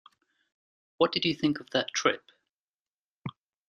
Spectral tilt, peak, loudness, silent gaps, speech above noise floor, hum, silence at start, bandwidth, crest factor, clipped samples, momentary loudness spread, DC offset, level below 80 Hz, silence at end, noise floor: -4 dB/octave; -8 dBFS; -28 LUFS; 2.49-3.22 s; over 62 dB; none; 1 s; 10.5 kHz; 24 dB; under 0.1%; 17 LU; under 0.1%; -70 dBFS; 0.4 s; under -90 dBFS